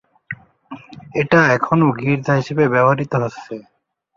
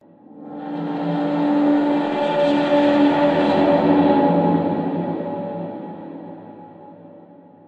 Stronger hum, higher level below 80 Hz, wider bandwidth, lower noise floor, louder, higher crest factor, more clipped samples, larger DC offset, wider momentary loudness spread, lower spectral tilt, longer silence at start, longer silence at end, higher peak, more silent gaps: neither; first, -56 dBFS vs -64 dBFS; first, 7.4 kHz vs 5.4 kHz; second, -38 dBFS vs -45 dBFS; about the same, -16 LUFS vs -18 LUFS; about the same, 18 dB vs 14 dB; neither; neither; about the same, 20 LU vs 18 LU; about the same, -7.5 dB/octave vs -8 dB/octave; about the same, 0.3 s vs 0.35 s; about the same, 0.55 s vs 0.5 s; about the same, -2 dBFS vs -4 dBFS; neither